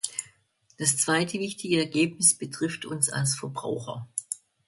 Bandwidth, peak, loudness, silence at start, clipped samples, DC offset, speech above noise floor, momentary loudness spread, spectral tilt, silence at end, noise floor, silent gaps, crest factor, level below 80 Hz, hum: 12 kHz; -8 dBFS; -26 LUFS; 0.05 s; under 0.1%; under 0.1%; 37 dB; 13 LU; -3 dB/octave; 0.3 s; -64 dBFS; none; 20 dB; -68 dBFS; none